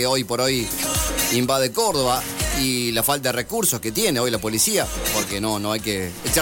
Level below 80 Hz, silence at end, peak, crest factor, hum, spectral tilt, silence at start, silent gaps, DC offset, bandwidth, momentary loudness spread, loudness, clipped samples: -38 dBFS; 0 s; -10 dBFS; 12 dB; none; -3 dB/octave; 0 s; none; under 0.1%; 17 kHz; 4 LU; -21 LUFS; under 0.1%